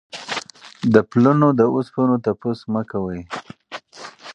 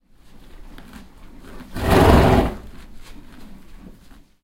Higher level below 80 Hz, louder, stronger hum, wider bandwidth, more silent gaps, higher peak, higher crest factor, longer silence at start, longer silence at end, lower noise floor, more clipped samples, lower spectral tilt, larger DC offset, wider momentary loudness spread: second, -54 dBFS vs -28 dBFS; second, -19 LUFS vs -16 LUFS; neither; second, 9.4 kHz vs 16 kHz; neither; about the same, 0 dBFS vs 0 dBFS; about the same, 20 dB vs 20 dB; second, 0.15 s vs 0.55 s; second, 0 s vs 0.65 s; second, -40 dBFS vs -46 dBFS; neither; about the same, -7 dB/octave vs -6.5 dB/octave; neither; second, 21 LU vs 25 LU